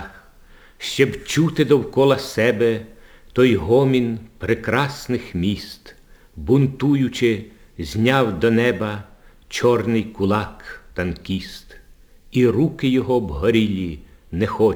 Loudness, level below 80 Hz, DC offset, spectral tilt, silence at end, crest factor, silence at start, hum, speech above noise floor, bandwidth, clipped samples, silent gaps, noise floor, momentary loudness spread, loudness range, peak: -20 LUFS; -44 dBFS; under 0.1%; -6.5 dB/octave; 0 s; 20 dB; 0 s; none; 28 dB; over 20 kHz; under 0.1%; none; -47 dBFS; 15 LU; 4 LU; 0 dBFS